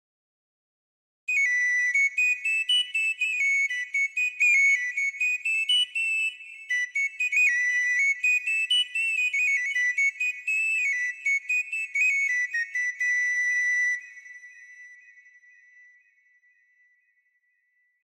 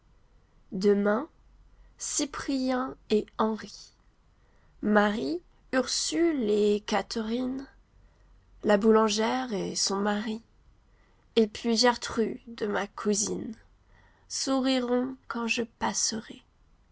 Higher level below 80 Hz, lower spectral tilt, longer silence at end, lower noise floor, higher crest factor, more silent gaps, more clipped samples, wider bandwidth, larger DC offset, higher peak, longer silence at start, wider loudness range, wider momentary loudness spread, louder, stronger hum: second, under -90 dBFS vs -58 dBFS; second, 8 dB/octave vs -3.5 dB/octave; first, 3.1 s vs 0.55 s; first, -71 dBFS vs -62 dBFS; second, 12 dB vs 20 dB; neither; neither; first, 14 kHz vs 8 kHz; neither; second, -14 dBFS vs -8 dBFS; first, 1.3 s vs 0.7 s; about the same, 5 LU vs 3 LU; second, 6 LU vs 13 LU; first, -23 LUFS vs -28 LUFS; neither